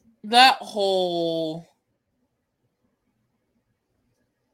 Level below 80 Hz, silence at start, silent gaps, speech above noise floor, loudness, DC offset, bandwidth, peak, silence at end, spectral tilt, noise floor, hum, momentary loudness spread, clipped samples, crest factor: -78 dBFS; 0.25 s; none; 54 dB; -20 LUFS; under 0.1%; 16.5 kHz; -2 dBFS; 2.9 s; -3 dB/octave; -74 dBFS; none; 15 LU; under 0.1%; 24 dB